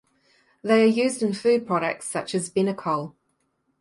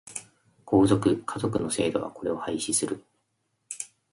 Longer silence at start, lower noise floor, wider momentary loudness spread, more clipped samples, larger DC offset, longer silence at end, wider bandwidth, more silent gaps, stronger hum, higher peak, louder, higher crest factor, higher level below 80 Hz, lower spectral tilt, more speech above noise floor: first, 0.65 s vs 0.05 s; second, -72 dBFS vs -76 dBFS; second, 10 LU vs 16 LU; neither; neither; first, 0.7 s vs 0.25 s; about the same, 11.5 kHz vs 11.5 kHz; neither; neither; about the same, -6 dBFS vs -8 dBFS; first, -23 LUFS vs -27 LUFS; about the same, 18 dB vs 20 dB; second, -70 dBFS vs -56 dBFS; about the same, -5 dB/octave vs -5 dB/octave; about the same, 49 dB vs 50 dB